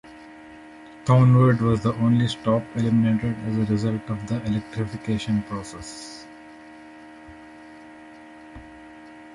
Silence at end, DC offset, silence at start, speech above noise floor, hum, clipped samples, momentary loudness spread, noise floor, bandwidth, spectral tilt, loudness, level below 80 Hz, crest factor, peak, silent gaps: 0 s; under 0.1%; 0.05 s; 23 dB; none; under 0.1%; 26 LU; -44 dBFS; 11.5 kHz; -7.5 dB/octave; -22 LUFS; -50 dBFS; 18 dB; -6 dBFS; none